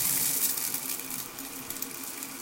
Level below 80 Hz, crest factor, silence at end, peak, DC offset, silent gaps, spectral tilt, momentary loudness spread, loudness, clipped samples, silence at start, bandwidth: -66 dBFS; 22 dB; 0 s; -10 dBFS; under 0.1%; none; -0.5 dB/octave; 12 LU; -30 LUFS; under 0.1%; 0 s; 17 kHz